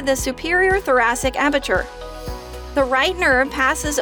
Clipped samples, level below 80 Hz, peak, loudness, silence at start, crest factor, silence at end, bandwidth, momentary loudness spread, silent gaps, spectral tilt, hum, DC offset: under 0.1%; -34 dBFS; -4 dBFS; -18 LUFS; 0 s; 14 dB; 0 s; over 20 kHz; 16 LU; none; -3 dB/octave; none; under 0.1%